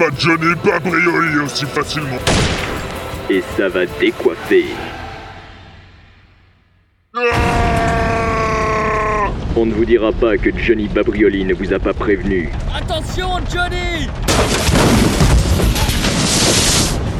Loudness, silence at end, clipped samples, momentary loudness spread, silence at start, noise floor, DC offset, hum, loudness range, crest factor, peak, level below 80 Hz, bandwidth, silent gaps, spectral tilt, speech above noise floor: -15 LUFS; 0 s; under 0.1%; 8 LU; 0 s; -56 dBFS; under 0.1%; none; 5 LU; 16 dB; 0 dBFS; -24 dBFS; 17.5 kHz; none; -4.5 dB/octave; 40 dB